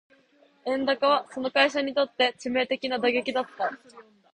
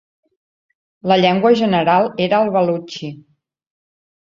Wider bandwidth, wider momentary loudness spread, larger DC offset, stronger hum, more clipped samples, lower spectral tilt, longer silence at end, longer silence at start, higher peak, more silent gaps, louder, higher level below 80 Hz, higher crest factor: first, 9.4 kHz vs 7.4 kHz; second, 9 LU vs 15 LU; neither; neither; neither; second, -3 dB/octave vs -6.5 dB/octave; second, 0.3 s vs 1.1 s; second, 0.65 s vs 1.05 s; second, -8 dBFS vs -2 dBFS; neither; second, -26 LUFS vs -15 LUFS; second, -72 dBFS vs -60 dBFS; about the same, 20 dB vs 16 dB